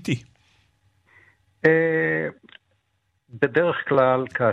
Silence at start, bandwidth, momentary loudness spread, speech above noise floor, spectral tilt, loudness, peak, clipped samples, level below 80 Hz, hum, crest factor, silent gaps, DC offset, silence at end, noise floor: 0.05 s; 10 kHz; 9 LU; 51 dB; -7 dB/octave; -22 LUFS; -4 dBFS; under 0.1%; -64 dBFS; none; 20 dB; none; under 0.1%; 0 s; -71 dBFS